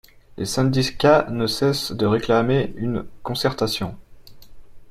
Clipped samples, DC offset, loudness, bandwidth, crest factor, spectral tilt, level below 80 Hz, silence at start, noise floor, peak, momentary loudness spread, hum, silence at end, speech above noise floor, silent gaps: under 0.1%; under 0.1%; -21 LUFS; 15.5 kHz; 20 dB; -5.5 dB/octave; -46 dBFS; 0.3 s; -41 dBFS; -2 dBFS; 11 LU; none; 0 s; 20 dB; none